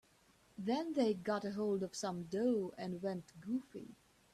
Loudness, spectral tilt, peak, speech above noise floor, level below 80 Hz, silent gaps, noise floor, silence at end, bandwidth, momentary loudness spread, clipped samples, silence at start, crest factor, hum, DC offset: -39 LUFS; -6 dB/octave; -24 dBFS; 31 dB; -76 dBFS; none; -70 dBFS; 0.4 s; 13.5 kHz; 14 LU; under 0.1%; 0.6 s; 16 dB; none; under 0.1%